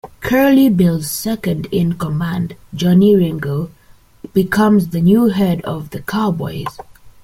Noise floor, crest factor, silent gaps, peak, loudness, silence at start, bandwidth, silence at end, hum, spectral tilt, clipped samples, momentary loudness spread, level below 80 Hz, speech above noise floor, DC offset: -38 dBFS; 14 dB; none; -2 dBFS; -15 LUFS; 0.05 s; 16 kHz; 0.15 s; none; -7 dB/octave; under 0.1%; 13 LU; -44 dBFS; 24 dB; under 0.1%